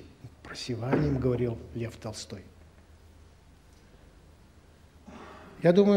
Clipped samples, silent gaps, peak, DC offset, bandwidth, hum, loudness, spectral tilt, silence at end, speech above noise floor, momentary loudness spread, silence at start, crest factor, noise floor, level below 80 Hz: under 0.1%; none; -10 dBFS; under 0.1%; 12.5 kHz; none; -30 LUFS; -7 dB/octave; 0 s; 30 dB; 23 LU; 0 s; 22 dB; -56 dBFS; -52 dBFS